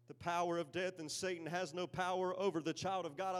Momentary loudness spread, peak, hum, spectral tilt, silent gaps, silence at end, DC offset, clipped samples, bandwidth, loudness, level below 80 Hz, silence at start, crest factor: 4 LU; -24 dBFS; none; -4 dB/octave; none; 0 s; under 0.1%; under 0.1%; 14.5 kHz; -40 LUFS; -76 dBFS; 0.1 s; 16 dB